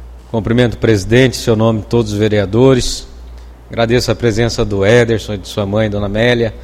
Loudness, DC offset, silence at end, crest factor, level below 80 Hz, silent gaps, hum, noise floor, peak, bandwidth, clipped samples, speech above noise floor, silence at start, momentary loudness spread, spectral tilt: -13 LUFS; under 0.1%; 0 s; 14 dB; -30 dBFS; none; none; -33 dBFS; 0 dBFS; 15 kHz; under 0.1%; 20 dB; 0 s; 9 LU; -6 dB/octave